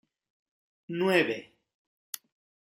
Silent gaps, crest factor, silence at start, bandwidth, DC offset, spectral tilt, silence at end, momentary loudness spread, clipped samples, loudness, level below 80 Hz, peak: 1.74-2.13 s; 24 dB; 0.9 s; 16 kHz; under 0.1%; -4.5 dB/octave; 0.6 s; 17 LU; under 0.1%; -28 LUFS; -82 dBFS; -10 dBFS